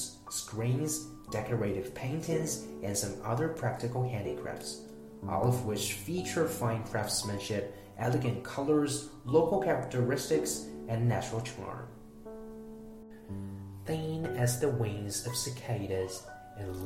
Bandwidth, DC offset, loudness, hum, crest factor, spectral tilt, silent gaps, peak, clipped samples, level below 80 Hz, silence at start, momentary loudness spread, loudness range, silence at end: 16 kHz; under 0.1%; -33 LUFS; none; 20 dB; -5 dB/octave; none; -12 dBFS; under 0.1%; -58 dBFS; 0 s; 15 LU; 6 LU; 0 s